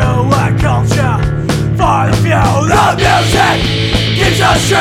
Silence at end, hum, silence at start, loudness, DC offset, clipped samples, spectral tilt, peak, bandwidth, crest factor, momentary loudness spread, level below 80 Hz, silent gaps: 0 s; none; 0 s; -11 LUFS; under 0.1%; under 0.1%; -5 dB/octave; 0 dBFS; 15.5 kHz; 10 dB; 4 LU; -22 dBFS; none